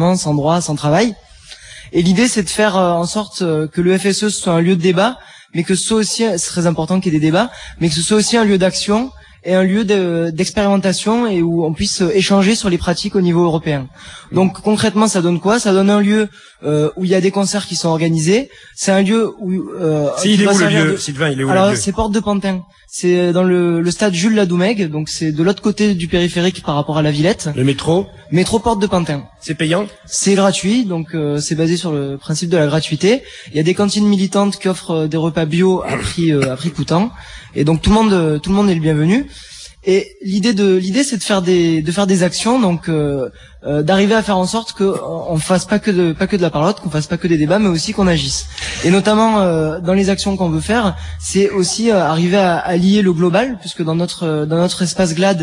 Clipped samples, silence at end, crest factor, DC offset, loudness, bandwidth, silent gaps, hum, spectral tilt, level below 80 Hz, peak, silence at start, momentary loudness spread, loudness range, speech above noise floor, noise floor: under 0.1%; 0 s; 14 dB; under 0.1%; -15 LUFS; 11.5 kHz; none; none; -5 dB/octave; -40 dBFS; 0 dBFS; 0 s; 7 LU; 2 LU; 23 dB; -38 dBFS